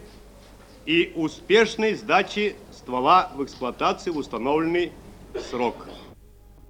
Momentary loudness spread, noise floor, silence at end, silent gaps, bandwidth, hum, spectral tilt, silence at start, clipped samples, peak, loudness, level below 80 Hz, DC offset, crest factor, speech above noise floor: 18 LU; -49 dBFS; 0.55 s; none; 16.5 kHz; none; -4.5 dB/octave; 0 s; under 0.1%; -4 dBFS; -23 LUFS; -50 dBFS; under 0.1%; 20 dB; 26 dB